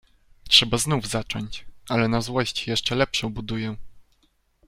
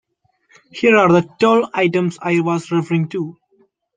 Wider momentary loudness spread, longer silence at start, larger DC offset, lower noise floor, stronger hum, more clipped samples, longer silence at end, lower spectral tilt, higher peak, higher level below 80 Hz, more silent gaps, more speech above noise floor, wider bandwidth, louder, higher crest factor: first, 16 LU vs 12 LU; second, 0.45 s vs 0.75 s; neither; first, -65 dBFS vs -60 dBFS; neither; neither; about the same, 0.65 s vs 0.65 s; second, -3.5 dB/octave vs -6.5 dB/octave; about the same, -2 dBFS vs -2 dBFS; first, -46 dBFS vs -60 dBFS; neither; second, 41 dB vs 45 dB; first, 16 kHz vs 9.4 kHz; second, -23 LUFS vs -16 LUFS; first, 24 dB vs 16 dB